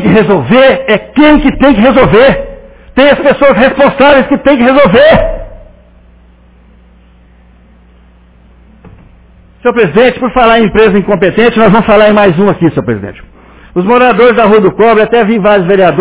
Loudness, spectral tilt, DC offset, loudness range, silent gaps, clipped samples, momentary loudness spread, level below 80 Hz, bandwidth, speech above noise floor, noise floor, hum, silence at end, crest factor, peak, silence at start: -6 LUFS; -10 dB/octave; under 0.1%; 6 LU; none; 4%; 9 LU; -28 dBFS; 4 kHz; 34 dB; -40 dBFS; none; 0 s; 8 dB; 0 dBFS; 0 s